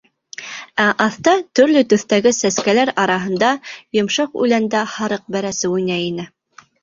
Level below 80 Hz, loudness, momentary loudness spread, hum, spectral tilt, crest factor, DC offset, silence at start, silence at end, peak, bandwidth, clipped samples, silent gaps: -60 dBFS; -17 LUFS; 11 LU; none; -4 dB/octave; 18 dB; under 0.1%; 0.4 s; 0.55 s; 0 dBFS; 7.8 kHz; under 0.1%; none